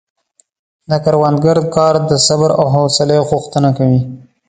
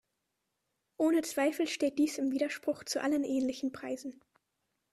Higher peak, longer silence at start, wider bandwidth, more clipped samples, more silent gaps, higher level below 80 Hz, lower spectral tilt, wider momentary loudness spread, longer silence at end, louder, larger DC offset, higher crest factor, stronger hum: first, 0 dBFS vs -18 dBFS; about the same, 0.9 s vs 1 s; second, 9.4 kHz vs 13.5 kHz; neither; neither; first, -46 dBFS vs -74 dBFS; first, -5.5 dB/octave vs -3 dB/octave; second, 5 LU vs 10 LU; second, 0.3 s vs 0.8 s; first, -12 LUFS vs -32 LUFS; neither; about the same, 14 dB vs 16 dB; neither